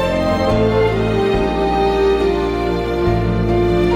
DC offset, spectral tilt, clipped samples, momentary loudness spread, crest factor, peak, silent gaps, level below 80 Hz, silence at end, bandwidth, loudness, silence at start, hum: under 0.1%; -7.5 dB/octave; under 0.1%; 3 LU; 12 dB; -4 dBFS; none; -26 dBFS; 0 s; 14.5 kHz; -16 LUFS; 0 s; none